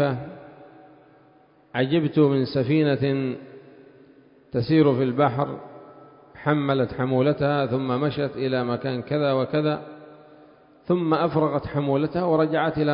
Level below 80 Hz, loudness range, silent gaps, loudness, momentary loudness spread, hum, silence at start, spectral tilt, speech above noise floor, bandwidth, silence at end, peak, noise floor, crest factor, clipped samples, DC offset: -56 dBFS; 2 LU; none; -23 LUFS; 11 LU; none; 0 s; -12 dB/octave; 34 dB; 5.4 kHz; 0 s; -6 dBFS; -56 dBFS; 18 dB; under 0.1%; under 0.1%